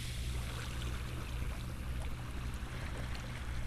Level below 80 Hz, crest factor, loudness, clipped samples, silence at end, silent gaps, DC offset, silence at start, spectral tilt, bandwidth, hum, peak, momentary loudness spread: -42 dBFS; 12 dB; -42 LUFS; under 0.1%; 0 s; none; under 0.1%; 0 s; -5 dB/octave; 14 kHz; none; -26 dBFS; 2 LU